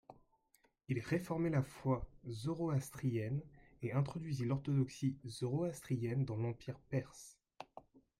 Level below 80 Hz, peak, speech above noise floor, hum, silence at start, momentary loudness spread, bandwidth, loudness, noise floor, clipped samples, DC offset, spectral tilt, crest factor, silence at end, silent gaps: -64 dBFS; -22 dBFS; 37 dB; none; 0.1 s; 13 LU; 14 kHz; -40 LUFS; -76 dBFS; under 0.1%; under 0.1%; -7.5 dB/octave; 16 dB; 0.2 s; none